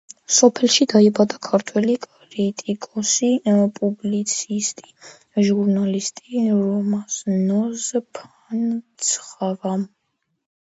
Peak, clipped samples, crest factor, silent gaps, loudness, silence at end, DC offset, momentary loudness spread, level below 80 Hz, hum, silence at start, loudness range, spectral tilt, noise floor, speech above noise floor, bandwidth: 0 dBFS; under 0.1%; 20 dB; none; -20 LUFS; 0.75 s; under 0.1%; 12 LU; -68 dBFS; none; 0.3 s; 5 LU; -4 dB/octave; -73 dBFS; 53 dB; 8 kHz